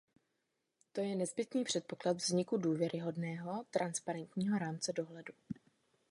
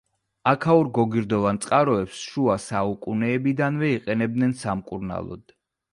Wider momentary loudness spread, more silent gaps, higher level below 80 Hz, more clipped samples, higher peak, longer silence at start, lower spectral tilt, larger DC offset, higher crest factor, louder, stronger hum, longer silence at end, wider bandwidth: about the same, 13 LU vs 11 LU; neither; second, -80 dBFS vs -54 dBFS; neither; second, -20 dBFS vs -4 dBFS; first, 0.95 s vs 0.45 s; second, -5 dB/octave vs -6.5 dB/octave; neither; about the same, 20 dB vs 18 dB; second, -38 LUFS vs -23 LUFS; neither; about the same, 0.6 s vs 0.55 s; about the same, 11.5 kHz vs 11.5 kHz